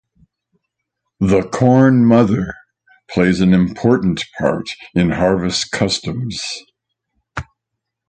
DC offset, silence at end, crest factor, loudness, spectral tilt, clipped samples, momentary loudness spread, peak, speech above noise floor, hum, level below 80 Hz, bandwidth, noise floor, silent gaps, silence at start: under 0.1%; 0.65 s; 16 dB; -16 LUFS; -6 dB/octave; under 0.1%; 15 LU; 0 dBFS; 64 dB; none; -42 dBFS; 9.4 kHz; -79 dBFS; none; 1.2 s